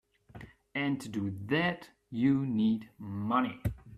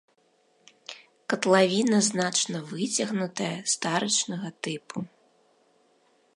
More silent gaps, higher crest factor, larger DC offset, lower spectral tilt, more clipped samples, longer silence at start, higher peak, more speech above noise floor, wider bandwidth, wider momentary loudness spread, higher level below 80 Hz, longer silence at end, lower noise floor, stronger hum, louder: neither; about the same, 18 dB vs 22 dB; neither; first, -7 dB/octave vs -3 dB/octave; neither; second, 0.35 s vs 0.9 s; second, -14 dBFS vs -6 dBFS; second, 21 dB vs 40 dB; first, 14 kHz vs 11.5 kHz; second, 15 LU vs 21 LU; first, -54 dBFS vs -78 dBFS; second, 0 s vs 1.3 s; second, -52 dBFS vs -66 dBFS; neither; second, -32 LUFS vs -26 LUFS